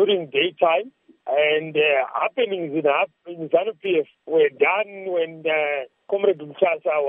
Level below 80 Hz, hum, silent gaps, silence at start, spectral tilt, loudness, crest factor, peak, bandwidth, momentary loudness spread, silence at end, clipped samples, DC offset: -82 dBFS; none; none; 0 s; -8 dB/octave; -22 LUFS; 18 dB; -4 dBFS; 3.8 kHz; 7 LU; 0 s; under 0.1%; under 0.1%